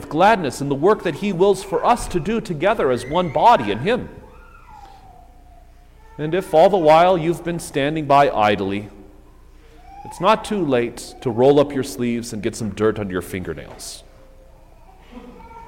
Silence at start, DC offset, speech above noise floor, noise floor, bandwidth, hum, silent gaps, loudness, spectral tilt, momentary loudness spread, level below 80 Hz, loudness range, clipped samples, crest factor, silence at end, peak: 0 s; under 0.1%; 27 dB; -45 dBFS; 16.5 kHz; none; none; -18 LUFS; -5.5 dB/octave; 15 LU; -44 dBFS; 7 LU; under 0.1%; 16 dB; 0.05 s; -4 dBFS